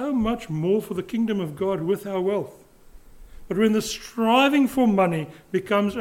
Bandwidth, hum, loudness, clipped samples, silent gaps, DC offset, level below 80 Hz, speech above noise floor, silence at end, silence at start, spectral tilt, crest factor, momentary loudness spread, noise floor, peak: 16.5 kHz; none; -23 LUFS; under 0.1%; none; under 0.1%; -50 dBFS; 25 dB; 0 s; 0 s; -5.5 dB/octave; 16 dB; 10 LU; -47 dBFS; -6 dBFS